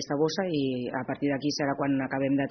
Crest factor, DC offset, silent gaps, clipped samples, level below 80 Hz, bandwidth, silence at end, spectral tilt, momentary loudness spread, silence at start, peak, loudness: 14 dB; under 0.1%; none; under 0.1%; -64 dBFS; 6.4 kHz; 0 s; -5 dB/octave; 3 LU; 0 s; -14 dBFS; -29 LUFS